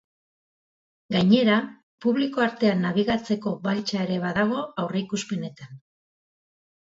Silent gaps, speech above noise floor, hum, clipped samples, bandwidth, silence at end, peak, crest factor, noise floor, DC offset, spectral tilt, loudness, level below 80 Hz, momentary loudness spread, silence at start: 1.83-1.98 s; over 66 dB; none; under 0.1%; 7.8 kHz; 1.05 s; -4 dBFS; 20 dB; under -90 dBFS; under 0.1%; -6 dB/octave; -24 LUFS; -60 dBFS; 10 LU; 1.1 s